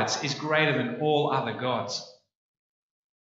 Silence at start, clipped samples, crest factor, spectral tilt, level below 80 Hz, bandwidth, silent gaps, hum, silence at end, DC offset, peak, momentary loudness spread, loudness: 0 s; under 0.1%; 20 dB; -4 dB/octave; -76 dBFS; 8 kHz; none; none; 1.1 s; under 0.1%; -10 dBFS; 7 LU; -27 LUFS